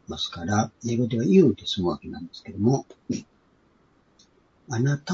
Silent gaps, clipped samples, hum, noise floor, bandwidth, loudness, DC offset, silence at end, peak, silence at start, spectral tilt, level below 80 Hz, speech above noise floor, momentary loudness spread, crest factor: none; under 0.1%; none; -62 dBFS; 7.6 kHz; -25 LUFS; under 0.1%; 0 s; -6 dBFS; 0.1 s; -6 dB/octave; -58 dBFS; 38 dB; 15 LU; 20 dB